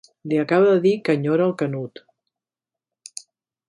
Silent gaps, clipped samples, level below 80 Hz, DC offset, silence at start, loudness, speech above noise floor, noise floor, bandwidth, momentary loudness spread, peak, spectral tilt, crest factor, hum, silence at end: none; under 0.1%; -70 dBFS; under 0.1%; 0.25 s; -20 LUFS; 70 dB; -89 dBFS; 11.5 kHz; 21 LU; -6 dBFS; -6.5 dB/octave; 16 dB; none; 1.8 s